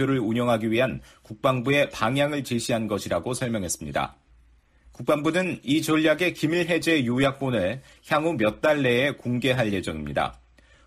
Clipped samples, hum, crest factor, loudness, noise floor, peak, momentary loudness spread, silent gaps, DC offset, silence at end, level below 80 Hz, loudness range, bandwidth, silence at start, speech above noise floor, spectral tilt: under 0.1%; none; 16 dB; -24 LUFS; -58 dBFS; -10 dBFS; 8 LU; none; under 0.1%; 0.5 s; -52 dBFS; 4 LU; 15 kHz; 0 s; 34 dB; -5 dB/octave